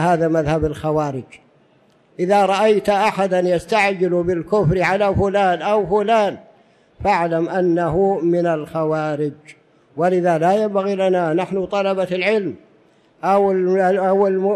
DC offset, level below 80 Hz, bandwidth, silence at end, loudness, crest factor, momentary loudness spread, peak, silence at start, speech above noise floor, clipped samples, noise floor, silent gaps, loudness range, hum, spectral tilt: under 0.1%; -44 dBFS; 12.5 kHz; 0 s; -18 LUFS; 12 dB; 6 LU; -6 dBFS; 0 s; 38 dB; under 0.1%; -55 dBFS; none; 2 LU; none; -6.5 dB/octave